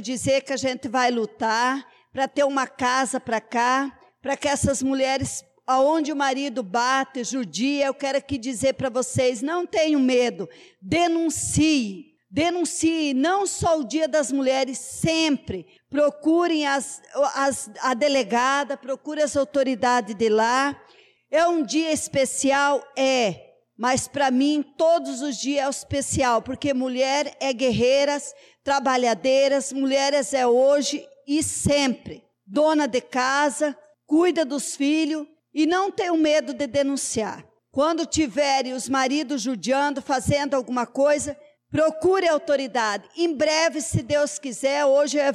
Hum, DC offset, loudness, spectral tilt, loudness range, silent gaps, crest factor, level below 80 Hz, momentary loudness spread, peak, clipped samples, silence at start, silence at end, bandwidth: none; under 0.1%; -23 LUFS; -3.5 dB/octave; 2 LU; none; 12 dB; -54 dBFS; 8 LU; -12 dBFS; under 0.1%; 0 s; 0 s; 14 kHz